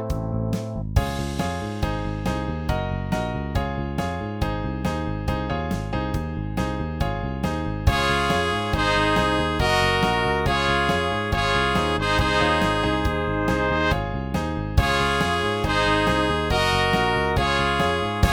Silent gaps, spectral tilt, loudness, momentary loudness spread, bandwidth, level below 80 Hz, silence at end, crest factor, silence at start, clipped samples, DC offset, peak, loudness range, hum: none; -5.5 dB/octave; -23 LUFS; 7 LU; 20 kHz; -32 dBFS; 0 s; 18 dB; 0 s; under 0.1%; under 0.1%; -6 dBFS; 6 LU; none